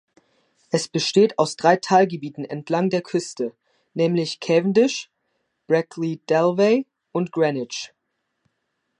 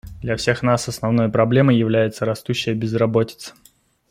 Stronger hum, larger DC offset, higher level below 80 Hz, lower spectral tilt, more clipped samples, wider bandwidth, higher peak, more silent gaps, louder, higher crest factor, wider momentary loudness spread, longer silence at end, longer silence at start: neither; neither; second, -74 dBFS vs -48 dBFS; about the same, -5 dB/octave vs -6 dB/octave; neither; second, 11 kHz vs 15.5 kHz; about the same, -2 dBFS vs -2 dBFS; neither; about the same, -21 LUFS vs -19 LUFS; about the same, 20 dB vs 18 dB; first, 13 LU vs 10 LU; first, 1.15 s vs 0.6 s; first, 0.75 s vs 0.05 s